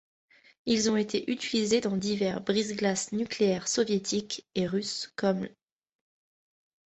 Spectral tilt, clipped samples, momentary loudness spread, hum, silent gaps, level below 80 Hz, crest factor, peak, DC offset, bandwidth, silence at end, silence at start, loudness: -4 dB/octave; under 0.1%; 6 LU; none; none; -66 dBFS; 16 dB; -14 dBFS; under 0.1%; 8.4 kHz; 1.4 s; 0.65 s; -29 LUFS